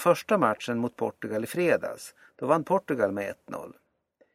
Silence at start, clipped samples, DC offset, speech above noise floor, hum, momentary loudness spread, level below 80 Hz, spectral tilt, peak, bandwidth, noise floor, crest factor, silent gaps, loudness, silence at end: 0 s; under 0.1%; under 0.1%; 40 dB; none; 16 LU; -70 dBFS; -5.5 dB/octave; -8 dBFS; 16 kHz; -67 dBFS; 20 dB; none; -27 LUFS; 0.6 s